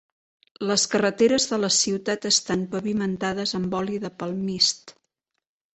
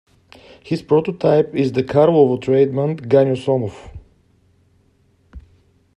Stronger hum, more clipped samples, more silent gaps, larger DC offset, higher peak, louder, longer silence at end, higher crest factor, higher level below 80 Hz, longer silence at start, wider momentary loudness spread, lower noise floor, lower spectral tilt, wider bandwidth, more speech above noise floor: neither; neither; neither; neither; second, -8 dBFS vs 0 dBFS; second, -23 LUFS vs -17 LUFS; first, 0.85 s vs 0.55 s; about the same, 18 dB vs 18 dB; second, -60 dBFS vs -50 dBFS; about the same, 0.6 s vs 0.65 s; about the same, 9 LU vs 11 LU; first, -79 dBFS vs -58 dBFS; second, -3 dB/octave vs -8.5 dB/octave; second, 8.4 kHz vs 10.5 kHz; first, 55 dB vs 42 dB